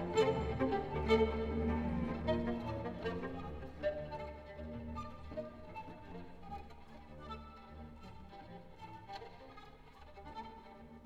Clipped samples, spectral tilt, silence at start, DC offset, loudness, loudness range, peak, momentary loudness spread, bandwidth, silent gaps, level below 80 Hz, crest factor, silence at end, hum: under 0.1%; -7 dB/octave; 0 s; under 0.1%; -40 LUFS; 16 LU; -18 dBFS; 21 LU; 9.4 kHz; none; -50 dBFS; 22 dB; 0 s; none